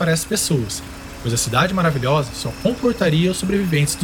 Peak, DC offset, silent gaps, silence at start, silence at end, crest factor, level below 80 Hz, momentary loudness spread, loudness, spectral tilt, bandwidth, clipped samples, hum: -4 dBFS; under 0.1%; none; 0 s; 0 s; 16 dB; -40 dBFS; 9 LU; -19 LUFS; -4.5 dB/octave; 19 kHz; under 0.1%; none